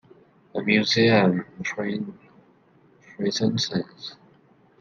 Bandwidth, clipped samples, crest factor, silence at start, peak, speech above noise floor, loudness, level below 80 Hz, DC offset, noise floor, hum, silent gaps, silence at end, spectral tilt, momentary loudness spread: 7.4 kHz; under 0.1%; 20 dB; 0.55 s; -4 dBFS; 35 dB; -23 LUFS; -64 dBFS; under 0.1%; -58 dBFS; none; none; 0.65 s; -5 dB/octave; 18 LU